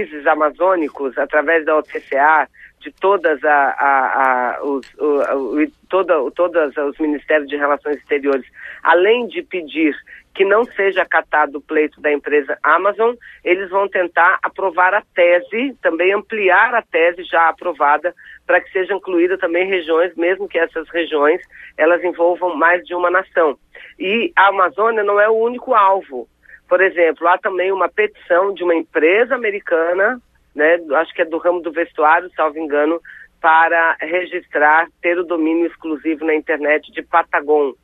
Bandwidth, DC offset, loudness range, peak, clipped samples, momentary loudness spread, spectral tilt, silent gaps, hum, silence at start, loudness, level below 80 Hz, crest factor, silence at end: 4.4 kHz; under 0.1%; 2 LU; 0 dBFS; under 0.1%; 8 LU; -6 dB/octave; none; none; 0 s; -16 LUFS; -60 dBFS; 16 dB; 0.1 s